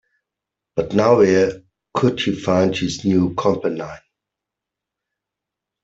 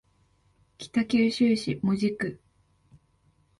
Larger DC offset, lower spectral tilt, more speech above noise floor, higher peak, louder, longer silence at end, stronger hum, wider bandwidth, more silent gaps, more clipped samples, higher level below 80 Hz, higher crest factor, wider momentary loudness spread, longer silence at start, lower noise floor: neither; about the same, -6 dB/octave vs -6 dB/octave; first, 67 dB vs 41 dB; first, -2 dBFS vs -12 dBFS; first, -18 LUFS vs -26 LUFS; first, 1.85 s vs 1.25 s; neither; second, 8 kHz vs 11.5 kHz; neither; neither; first, -54 dBFS vs -64 dBFS; about the same, 18 dB vs 16 dB; first, 14 LU vs 11 LU; about the same, 0.75 s vs 0.8 s; first, -84 dBFS vs -66 dBFS